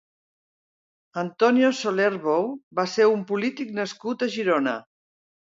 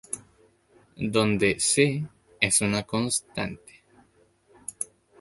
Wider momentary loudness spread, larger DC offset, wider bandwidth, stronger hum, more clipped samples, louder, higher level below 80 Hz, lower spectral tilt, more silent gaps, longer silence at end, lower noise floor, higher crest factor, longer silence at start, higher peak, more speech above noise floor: second, 9 LU vs 17 LU; neither; second, 7.8 kHz vs 12 kHz; neither; neither; about the same, -24 LUFS vs -25 LUFS; second, -76 dBFS vs -56 dBFS; first, -5 dB/octave vs -3.5 dB/octave; first, 2.63-2.71 s vs none; first, 0.75 s vs 0.35 s; first, under -90 dBFS vs -62 dBFS; second, 18 dB vs 26 dB; first, 1.15 s vs 0.1 s; second, -6 dBFS vs -2 dBFS; first, over 67 dB vs 37 dB